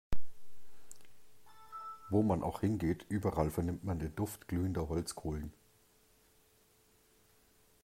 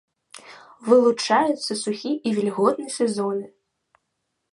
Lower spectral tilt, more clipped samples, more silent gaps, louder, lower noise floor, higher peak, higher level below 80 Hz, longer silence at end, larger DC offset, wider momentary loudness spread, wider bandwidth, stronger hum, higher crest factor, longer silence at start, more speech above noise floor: first, -7 dB/octave vs -4.5 dB/octave; neither; neither; second, -37 LUFS vs -22 LUFS; second, -69 dBFS vs -77 dBFS; second, -16 dBFS vs -4 dBFS; first, -52 dBFS vs -72 dBFS; first, 2.35 s vs 1.05 s; neither; about the same, 17 LU vs 17 LU; first, 16 kHz vs 11.5 kHz; neither; about the same, 20 dB vs 20 dB; second, 0.1 s vs 0.45 s; second, 34 dB vs 56 dB